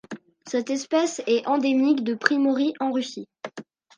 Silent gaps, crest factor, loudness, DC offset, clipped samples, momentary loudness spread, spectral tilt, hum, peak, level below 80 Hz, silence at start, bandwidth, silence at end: none; 22 dB; -23 LUFS; under 0.1%; under 0.1%; 18 LU; -3.5 dB/octave; none; -2 dBFS; -78 dBFS; 0.1 s; 9.8 kHz; 0.35 s